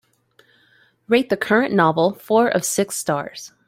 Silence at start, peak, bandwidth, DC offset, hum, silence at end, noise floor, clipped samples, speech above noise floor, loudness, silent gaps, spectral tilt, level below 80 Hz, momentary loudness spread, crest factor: 1.1 s; -2 dBFS; 16.5 kHz; under 0.1%; none; 0.2 s; -58 dBFS; under 0.1%; 39 dB; -19 LUFS; none; -4.5 dB/octave; -64 dBFS; 7 LU; 18 dB